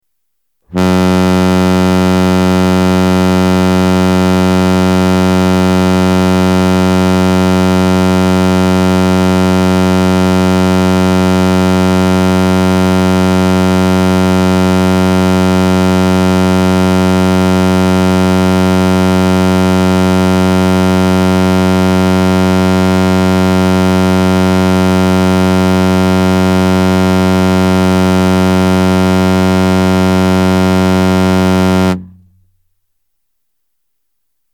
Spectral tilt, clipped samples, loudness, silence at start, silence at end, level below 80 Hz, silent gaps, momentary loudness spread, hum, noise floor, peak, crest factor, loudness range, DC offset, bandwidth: -6.5 dB/octave; under 0.1%; -10 LUFS; 0.7 s; 2.45 s; -40 dBFS; none; 0 LU; none; -71 dBFS; 0 dBFS; 8 dB; 0 LU; under 0.1%; 17 kHz